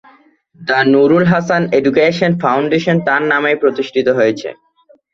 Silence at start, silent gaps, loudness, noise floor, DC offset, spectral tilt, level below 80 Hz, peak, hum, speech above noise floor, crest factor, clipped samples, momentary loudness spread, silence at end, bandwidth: 0.6 s; none; -13 LUFS; -49 dBFS; under 0.1%; -7 dB/octave; -54 dBFS; 0 dBFS; none; 36 dB; 14 dB; under 0.1%; 6 LU; 0.6 s; 7.4 kHz